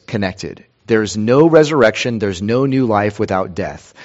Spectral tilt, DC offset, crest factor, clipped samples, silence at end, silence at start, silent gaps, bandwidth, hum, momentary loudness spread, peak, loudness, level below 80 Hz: -6 dB/octave; under 0.1%; 16 dB; under 0.1%; 0 s; 0.1 s; none; 8 kHz; none; 14 LU; 0 dBFS; -15 LUFS; -48 dBFS